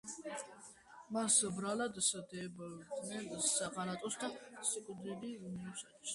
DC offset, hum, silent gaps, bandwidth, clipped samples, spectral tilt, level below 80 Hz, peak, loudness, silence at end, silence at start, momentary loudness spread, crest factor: under 0.1%; none; none; 11.5 kHz; under 0.1%; -2.5 dB/octave; -76 dBFS; -18 dBFS; -38 LUFS; 0 s; 0.05 s; 16 LU; 24 dB